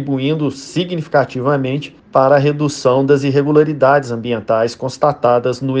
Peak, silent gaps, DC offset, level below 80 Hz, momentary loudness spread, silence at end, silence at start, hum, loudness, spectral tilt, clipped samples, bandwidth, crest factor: 0 dBFS; none; under 0.1%; -56 dBFS; 8 LU; 0 s; 0 s; none; -15 LUFS; -6.5 dB/octave; under 0.1%; 9.6 kHz; 14 dB